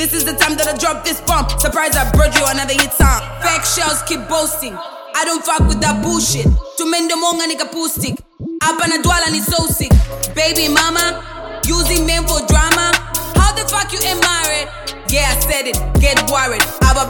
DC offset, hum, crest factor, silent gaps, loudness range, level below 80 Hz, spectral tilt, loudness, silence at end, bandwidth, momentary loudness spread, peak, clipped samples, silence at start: under 0.1%; none; 14 dB; none; 2 LU; -20 dBFS; -3 dB/octave; -14 LUFS; 0 s; 17.5 kHz; 6 LU; 0 dBFS; under 0.1%; 0 s